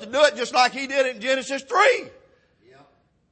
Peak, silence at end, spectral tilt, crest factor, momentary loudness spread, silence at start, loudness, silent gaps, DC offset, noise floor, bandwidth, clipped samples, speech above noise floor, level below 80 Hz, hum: -4 dBFS; 1.2 s; -1.5 dB/octave; 18 dB; 6 LU; 0 s; -21 LUFS; none; under 0.1%; -60 dBFS; 8.8 kHz; under 0.1%; 39 dB; -70 dBFS; none